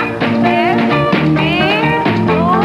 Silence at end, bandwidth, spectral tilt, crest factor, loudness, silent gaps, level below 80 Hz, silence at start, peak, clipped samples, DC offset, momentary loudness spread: 0 s; 13 kHz; -7.5 dB/octave; 12 dB; -13 LUFS; none; -40 dBFS; 0 s; -2 dBFS; under 0.1%; under 0.1%; 1 LU